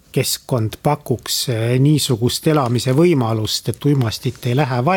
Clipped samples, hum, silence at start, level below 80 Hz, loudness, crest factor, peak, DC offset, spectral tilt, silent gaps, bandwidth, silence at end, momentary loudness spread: under 0.1%; none; 0.15 s; -50 dBFS; -18 LUFS; 14 dB; -2 dBFS; under 0.1%; -5.5 dB/octave; none; 18.5 kHz; 0 s; 6 LU